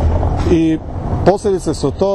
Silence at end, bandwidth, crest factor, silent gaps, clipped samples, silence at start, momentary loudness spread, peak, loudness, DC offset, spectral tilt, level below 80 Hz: 0 s; 11.5 kHz; 14 dB; none; under 0.1%; 0 s; 6 LU; 0 dBFS; -16 LUFS; under 0.1%; -7.5 dB/octave; -22 dBFS